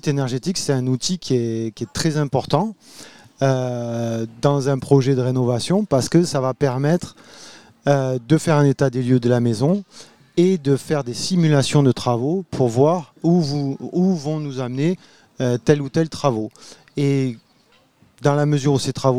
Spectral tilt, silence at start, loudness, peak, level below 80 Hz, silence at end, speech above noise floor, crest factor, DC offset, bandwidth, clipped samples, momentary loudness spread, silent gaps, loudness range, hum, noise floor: -6.5 dB/octave; 0.05 s; -20 LUFS; 0 dBFS; -54 dBFS; 0 s; 38 dB; 18 dB; 0.3%; 13.5 kHz; under 0.1%; 8 LU; none; 3 LU; none; -57 dBFS